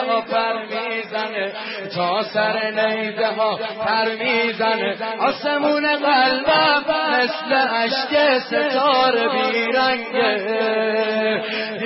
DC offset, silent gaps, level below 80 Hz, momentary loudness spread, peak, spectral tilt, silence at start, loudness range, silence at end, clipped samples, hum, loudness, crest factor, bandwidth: under 0.1%; none; -64 dBFS; 8 LU; -6 dBFS; -7.5 dB/octave; 0 s; 4 LU; 0 s; under 0.1%; none; -19 LUFS; 14 dB; 5.8 kHz